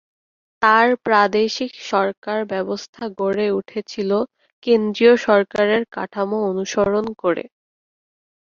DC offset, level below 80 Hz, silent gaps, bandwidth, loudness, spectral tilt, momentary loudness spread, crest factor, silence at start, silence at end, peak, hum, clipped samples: under 0.1%; -60 dBFS; 2.17-2.22 s, 2.89-2.93 s, 4.52-4.62 s; 7.4 kHz; -19 LUFS; -5 dB/octave; 12 LU; 18 dB; 0.6 s; 1 s; -2 dBFS; none; under 0.1%